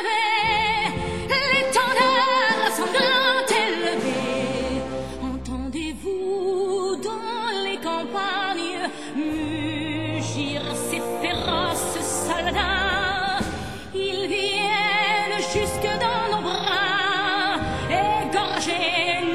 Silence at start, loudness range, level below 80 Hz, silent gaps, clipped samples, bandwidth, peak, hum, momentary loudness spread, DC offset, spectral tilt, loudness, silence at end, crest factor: 0 s; 7 LU; -44 dBFS; none; under 0.1%; 16 kHz; -4 dBFS; none; 9 LU; 0.6%; -3 dB/octave; -23 LUFS; 0 s; 18 dB